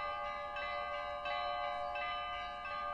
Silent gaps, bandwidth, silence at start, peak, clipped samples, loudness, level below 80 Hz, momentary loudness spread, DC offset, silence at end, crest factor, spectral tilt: none; 11 kHz; 0 s; -28 dBFS; under 0.1%; -40 LUFS; -62 dBFS; 3 LU; under 0.1%; 0 s; 12 dB; -3.5 dB/octave